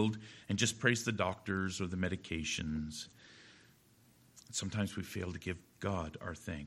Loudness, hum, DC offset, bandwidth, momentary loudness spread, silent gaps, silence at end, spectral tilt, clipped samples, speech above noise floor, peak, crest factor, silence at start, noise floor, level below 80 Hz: -37 LUFS; none; under 0.1%; 16 kHz; 14 LU; none; 0 s; -4 dB/octave; under 0.1%; 29 dB; -14 dBFS; 24 dB; 0 s; -66 dBFS; -58 dBFS